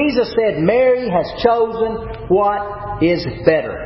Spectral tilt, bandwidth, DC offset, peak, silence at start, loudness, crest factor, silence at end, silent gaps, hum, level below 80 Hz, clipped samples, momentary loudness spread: -10.5 dB/octave; 5.8 kHz; under 0.1%; 0 dBFS; 0 s; -17 LUFS; 16 dB; 0 s; none; none; -38 dBFS; under 0.1%; 7 LU